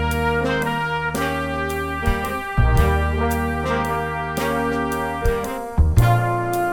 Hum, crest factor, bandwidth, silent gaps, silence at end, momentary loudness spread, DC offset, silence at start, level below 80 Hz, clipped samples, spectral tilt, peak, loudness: none; 18 dB; 19 kHz; none; 0 s; 6 LU; under 0.1%; 0 s; -26 dBFS; under 0.1%; -6 dB/octave; -2 dBFS; -21 LUFS